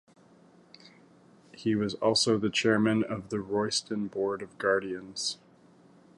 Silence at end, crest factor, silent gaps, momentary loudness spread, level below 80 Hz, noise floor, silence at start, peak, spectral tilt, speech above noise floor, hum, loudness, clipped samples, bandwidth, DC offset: 0.85 s; 18 dB; none; 9 LU; -66 dBFS; -58 dBFS; 1.55 s; -12 dBFS; -4 dB/octave; 30 dB; none; -29 LUFS; under 0.1%; 11.5 kHz; under 0.1%